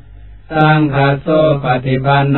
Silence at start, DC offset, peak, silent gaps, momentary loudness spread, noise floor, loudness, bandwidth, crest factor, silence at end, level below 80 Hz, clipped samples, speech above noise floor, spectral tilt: 0.15 s; 0.8%; 0 dBFS; none; 4 LU; -36 dBFS; -13 LUFS; 4.3 kHz; 12 dB; 0 s; -38 dBFS; under 0.1%; 25 dB; -10.5 dB/octave